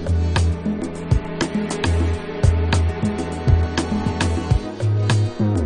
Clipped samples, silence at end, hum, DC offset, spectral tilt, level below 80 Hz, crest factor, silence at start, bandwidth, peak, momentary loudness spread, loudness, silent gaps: under 0.1%; 0 s; none; under 0.1%; -6.5 dB/octave; -26 dBFS; 16 dB; 0 s; 10.5 kHz; -4 dBFS; 5 LU; -21 LUFS; none